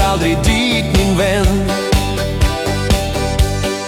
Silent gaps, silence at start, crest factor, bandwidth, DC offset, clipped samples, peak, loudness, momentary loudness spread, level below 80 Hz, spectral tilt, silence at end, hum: none; 0 s; 14 dB; 17.5 kHz; under 0.1%; under 0.1%; 0 dBFS; -15 LUFS; 3 LU; -20 dBFS; -5 dB/octave; 0 s; none